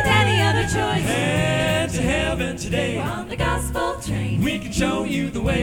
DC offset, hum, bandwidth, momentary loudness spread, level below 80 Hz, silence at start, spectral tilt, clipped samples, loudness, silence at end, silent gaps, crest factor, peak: under 0.1%; none; 17.5 kHz; 7 LU; -34 dBFS; 0 s; -5 dB/octave; under 0.1%; -21 LUFS; 0 s; none; 18 dB; -4 dBFS